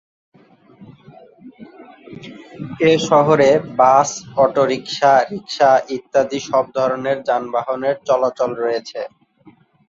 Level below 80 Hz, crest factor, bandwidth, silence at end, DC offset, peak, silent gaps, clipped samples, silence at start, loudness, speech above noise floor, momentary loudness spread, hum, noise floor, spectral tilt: -60 dBFS; 16 dB; 7.8 kHz; 0.8 s; under 0.1%; -2 dBFS; none; under 0.1%; 0.8 s; -17 LUFS; 34 dB; 17 LU; none; -50 dBFS; -4.5 dB/octave